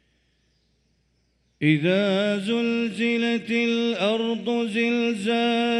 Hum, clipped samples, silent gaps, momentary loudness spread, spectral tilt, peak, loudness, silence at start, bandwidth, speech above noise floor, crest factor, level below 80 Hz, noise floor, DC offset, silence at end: none; under 0.1%; none; 4 LU; -6 dB/octave; -8 dBFS; -23 LUFS; 1.6 s; 11 kHz; 45 dB; 16 dB; -68 dBFS; -68 dBFS; under 0.1%; 0 s